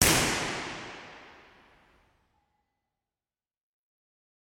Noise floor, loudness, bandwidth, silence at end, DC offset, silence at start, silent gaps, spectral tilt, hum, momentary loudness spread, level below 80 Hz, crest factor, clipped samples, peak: under -90 dBFS; -28 LUFS; 16 kHz; 3.25 s; under 0.1%; 0 s; none; -2 dB/octave; none; 24 LU; -50 dBFS; 32 dB; under 0.1%; -4 dBFS